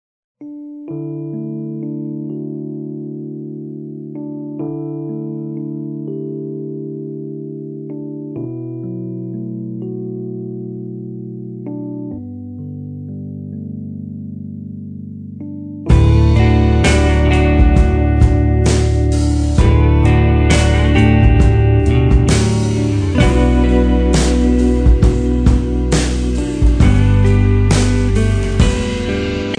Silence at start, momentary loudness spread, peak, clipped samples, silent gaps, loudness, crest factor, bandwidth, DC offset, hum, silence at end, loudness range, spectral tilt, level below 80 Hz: 0.4 s; 16 LU; 0 dBFS; under 0.1%; none; -15 LUFS; 14 dB; 10 kHz; under 0.1%; none; 0.05 s; 15 LU; -6.5 dB/octave; -18 dBFS